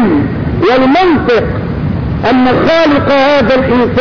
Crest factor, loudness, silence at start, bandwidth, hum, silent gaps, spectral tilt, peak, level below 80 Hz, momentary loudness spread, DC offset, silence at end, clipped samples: 6 dB; -10 LUFS; 0 s; 5.4 kHz; none; none; -7.5 dB/octave; -2 dBFS; -26 dBFS; 8 LU; under 0.1%; 0 s; under 0.1%